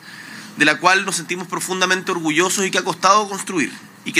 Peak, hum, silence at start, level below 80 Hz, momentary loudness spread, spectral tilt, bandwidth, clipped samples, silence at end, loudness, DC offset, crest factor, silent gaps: 0 dBFS; none; 0 s; -76 dBFS; 12 LU; -2.5 dB/octave; 16 kHz; under 0.1%; 0 s; -18 LUFS; under 0.1%; 20 dB; none